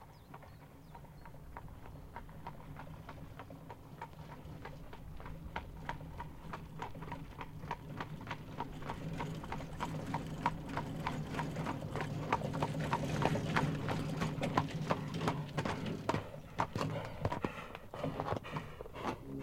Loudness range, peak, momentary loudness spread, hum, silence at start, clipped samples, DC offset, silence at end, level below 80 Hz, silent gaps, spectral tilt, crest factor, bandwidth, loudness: 14 LU; -12 dBFS; 16 LU; none; 0 s; under 0.1%; under 0.1%; 0 s; -54 dBFS; none; -6 dB/octave; 28 dB; 16.5 kHz; -41 LUFS